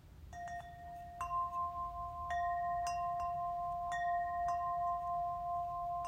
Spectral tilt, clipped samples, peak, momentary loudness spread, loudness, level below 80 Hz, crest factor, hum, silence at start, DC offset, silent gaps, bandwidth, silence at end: -4.5 dB/octave; under 0.1%; -26 dBFS; 10 LU; -39 LUFS; -58 dBFS; 14 dB; none; 0.05 s; under 0.1%; none; 15.5 kHz; 0 s